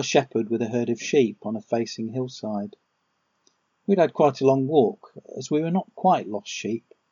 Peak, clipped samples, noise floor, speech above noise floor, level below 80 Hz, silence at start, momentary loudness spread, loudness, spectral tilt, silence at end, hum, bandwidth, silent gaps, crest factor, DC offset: -4 dBFS; under 0.1%; -73 dBFS; 49 dB; -78 dBFS; 0 s; 13 LU; -24 LUFS; -5.5 dB/octave; 0.3 s; none; 7.4 kHz; none; 20 dB; under 0.1%